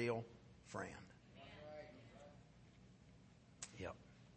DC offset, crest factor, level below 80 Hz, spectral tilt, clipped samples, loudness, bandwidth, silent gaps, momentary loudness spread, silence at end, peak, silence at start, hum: under 0.1%; 24 dB; -74 dBFS; -5 dB/octave; under 0.1%; -53 LUFS; 8.4 kHz; none; 16 LU; 0 s; -28 dBFS; 0 s; none